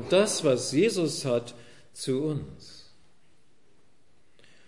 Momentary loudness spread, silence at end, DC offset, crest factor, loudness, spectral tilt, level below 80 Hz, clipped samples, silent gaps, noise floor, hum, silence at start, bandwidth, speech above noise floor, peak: 22 LU; 1.9 s; 0.3%; 20 dB; -27 LUFS; -4.5 dB/octave; -66 dBFS; under 0.1%; none; -67 dBFS; none; 0 s; 11.5 kHz; 41 dB; -10 dBFS